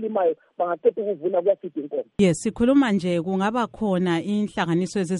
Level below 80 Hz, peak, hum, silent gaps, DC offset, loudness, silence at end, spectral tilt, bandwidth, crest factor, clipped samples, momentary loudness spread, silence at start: -54 dBFS; -8 dBFS; none; none; under 0.1%; -23 LUFS; 0 s; -6.5 dB/octave; 11.5 kHz; 16 dB; under 0.1%; 8 LU; 0 s